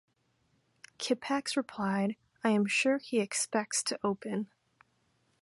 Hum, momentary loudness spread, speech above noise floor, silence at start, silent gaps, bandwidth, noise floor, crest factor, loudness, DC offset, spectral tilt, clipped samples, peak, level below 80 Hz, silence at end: none; 9 LU; 42 dB; 1 s; none; 11.5 kHz; -74 dBFS; 20 dB; -32 LUFS; under 0.1%; -3.5 dB/octave; under 0.1%; -14 dBFS; -76 dBFS; 0.95 s